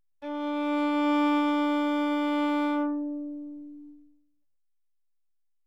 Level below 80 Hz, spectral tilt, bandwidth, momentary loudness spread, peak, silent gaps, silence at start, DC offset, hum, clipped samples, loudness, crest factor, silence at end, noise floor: -80 dBFS; -4 dB/octave; 7.8 kHz; 15 LU; -16 dBFS; none; 0.2 s; 0.2%; none; under 0.1%; -27 LUFS; 14 dB; 1.7 s; under -90 dBFS